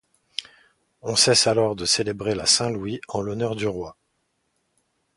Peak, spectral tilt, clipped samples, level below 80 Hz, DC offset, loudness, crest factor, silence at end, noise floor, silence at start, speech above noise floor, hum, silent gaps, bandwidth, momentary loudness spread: -4 dBFS; -2.5 dB/octave; under 0.1%; -54 dBFS; under 0.1%; -21 LUFS; 22 dB; 1.25 s; -72 dBFS; 0.4 s; 50 dB; none; none; 11.5 kHz; 18 LU